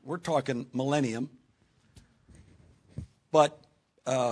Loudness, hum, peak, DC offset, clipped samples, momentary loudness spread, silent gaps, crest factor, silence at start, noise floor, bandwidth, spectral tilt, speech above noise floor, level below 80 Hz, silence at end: -29 LUFS; none; -8 dBFS; under 0.1%; under 0.1%; 21 LU; none; 24 dB; 0.05 s; -67 dBFS; 11 kHz; -5.5 dB/octave; 39 dB; -62 dBFS; 0 s